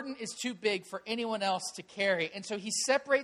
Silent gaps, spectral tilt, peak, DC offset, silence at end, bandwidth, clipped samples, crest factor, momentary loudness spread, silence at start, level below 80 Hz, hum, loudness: none; -2.5 dB/octave; -14 dBFS; under 0.1%; 0 s; 14 kHz; under 0.1%; 18 dB; 8 LU; 0 s; -80 dBFS; none; -32 LUFS